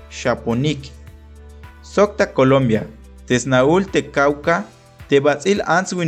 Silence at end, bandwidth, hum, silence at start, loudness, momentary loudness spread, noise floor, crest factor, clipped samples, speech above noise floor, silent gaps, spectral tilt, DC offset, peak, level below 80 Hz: 0 s; 10 kHz; none; 0 s; -18 LUFS; 8 LU; -40 dBFS; 14 dB; under 0.1%; 23 dB; none; -5.5 dB/octave; under 0.1%; -4 dBFS; -42 dBFS